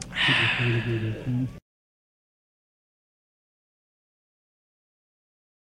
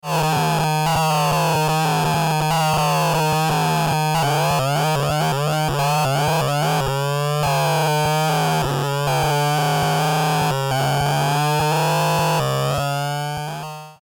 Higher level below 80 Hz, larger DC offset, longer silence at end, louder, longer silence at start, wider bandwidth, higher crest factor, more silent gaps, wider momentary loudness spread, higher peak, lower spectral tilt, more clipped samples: second, -54 dBFS vs -44 dBFS; neither; first, 4.05 s vs 0.1 s; second, -24 LUFS vs -19 LUFS; about the same, 0 s vs 0.05 s; second, 10.5 kHz vs 20 kHz; first, 22 dB vs 10 dB; neither; first, 10 LU vs 3 LU; about the same, -10 dBFS vs -10 dBFS; about the same, -5 dB/octave vs -4.5 dB/octave; neither